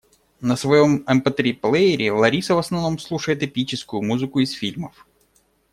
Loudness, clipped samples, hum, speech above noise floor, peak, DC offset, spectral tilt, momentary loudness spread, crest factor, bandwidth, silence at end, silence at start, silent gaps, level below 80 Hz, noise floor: -20 LUFS; under 0.1%; none; 42 dB; -2 dBFS; under 0.1%; -5.5 dB/octave; 10 LU; 18 dB; 14 kHz; 0.85 s; 0.4 s; none; -56 dBFS; -62 dBFS